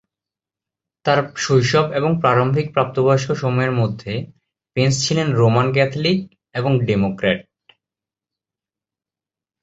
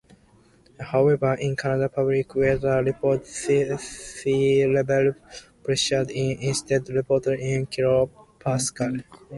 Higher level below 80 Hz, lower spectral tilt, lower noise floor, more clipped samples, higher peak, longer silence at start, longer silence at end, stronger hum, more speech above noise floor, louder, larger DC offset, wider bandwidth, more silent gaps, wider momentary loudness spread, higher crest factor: about the same, -52 dBFS vs -52 dBFS; about the same, -5.5 dB/octave vs -5 dB/octave; first, -89 dBFS vs -57 dBFS; neither; first, 0 dBFS vs -8 dBFS; first, 1.05 s vs 0.8 s; first, 2.2 s vs 0 s; neither; first, 72 dB vs 34 dB; first, -18 LUFS vs -23 LUFS; neither; second, 8 kHz vs 11.5 kHz; neither; about the same, 10 LU vs 9 LU; about the same, 18 dB vs 16 dB